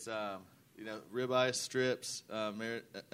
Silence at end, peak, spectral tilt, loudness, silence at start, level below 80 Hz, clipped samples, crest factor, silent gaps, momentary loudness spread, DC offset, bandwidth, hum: 0.1 s; -16 dBFS; -3.5 dB/octave; -37 LUFS; 0 s; -80 dBFS; under 0.1%; 22 dB; none; 14 LU; under 0.1%; 16 kHz; none